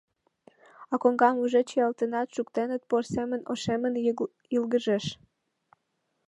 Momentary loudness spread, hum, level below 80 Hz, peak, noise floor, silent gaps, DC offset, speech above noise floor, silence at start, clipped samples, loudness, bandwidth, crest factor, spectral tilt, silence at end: 9 LU; none; -66 dBFS; -8 dBFS; -78 dBFS; none; under 0.1%; 51 dB; 0.8 s; under 0.1%; -28 LUFS; 11 kHz; 20 dB; -5.5 dB/octave; 1.15 s